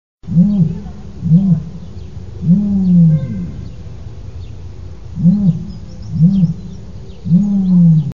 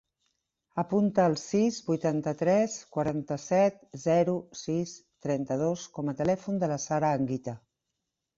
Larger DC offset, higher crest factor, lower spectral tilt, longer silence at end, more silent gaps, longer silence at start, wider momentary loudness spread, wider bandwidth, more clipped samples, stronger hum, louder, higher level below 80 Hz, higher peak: first, 2% vs under 0.1%; about the same, 14 dB vs 16 dB; first, -11 dB/octave vs -6.5 dB/octave; second, 0 s vs 0.8 s; neither; second, 0.15 s vs 0.75 s; first, 21 LU vs 9 LU; second, 5.4 kHz vs 8 kHz; neither; neither; first, -13 LUFS vs -29 LUFS; first, -36 dBFS vs -66 dBFS; first, 0 dBFS vs -12 dBFS